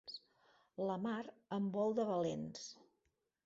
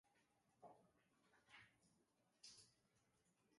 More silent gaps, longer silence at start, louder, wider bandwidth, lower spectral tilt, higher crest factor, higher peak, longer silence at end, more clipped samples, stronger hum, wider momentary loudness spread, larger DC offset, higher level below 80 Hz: neither; about the same, 0.05 s vs 0.05 s; first, -41 LUFS vs -67 LUFS; second, 7.6 kHz vs 11.5 kHz; first, -5.5 dB/octave vs -2 dB/octave; second, 16 dB vs 24 dB; first, -26 dBFS vs -48 dBFS; first, 0.7 s vs 0 s; neither; neither; first, 15 LU vs 5 LU; neither; first, -80 dBFS vs under -90 dBFS